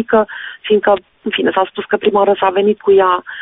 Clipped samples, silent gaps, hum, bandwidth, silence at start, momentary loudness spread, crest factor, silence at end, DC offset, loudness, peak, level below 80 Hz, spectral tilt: under 0.1%; none; none; 4 kHz; 0 s; 6 LU; 12 dB; 0 s; under 0.1%; -14 LUFS; -2 dBFS; -54 dBFS; -2.5 dB/octave